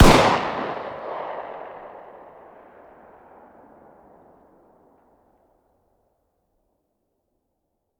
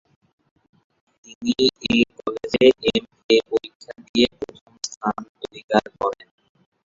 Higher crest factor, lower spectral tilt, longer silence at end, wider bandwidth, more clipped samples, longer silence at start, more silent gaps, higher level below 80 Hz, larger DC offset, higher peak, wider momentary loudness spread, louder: about the same, 24 dB vs 20 dB; about the same, -5 dB/octave vs -4 dB/octave; first, 6 s vs 0.75 s; first, 19 kHz vs 7.8 kHz; neither; second, 0 s vs 1.4 s; second, none vs 3.24-3.29 s, 3.75-3.80 s, 4.09-4.14 s, 4.61-4.66 s, 4.97-5.01 s, 5.29-5.35 s, 5.64-5.68 s; first, -34 dBFS vs -54 dBFS; neither; about the same, 0 dBFS vs -2 dBFS; first, 29 LU vs 19 LU; about the same, -23 LUFS vs -21 LUFS